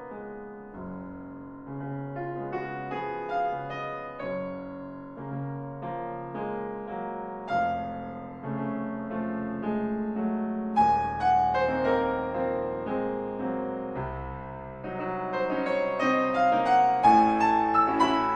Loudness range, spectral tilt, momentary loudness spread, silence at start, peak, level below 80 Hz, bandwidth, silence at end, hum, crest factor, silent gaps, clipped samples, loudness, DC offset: 11 LU; -7 dB/octave; 17 LU; 0 s; -8 dBFS; -54 dBFS; 8.8 kHz; 0 s; none; 20 dB; none; under 0.1%; -28 LUFS; under 0.1%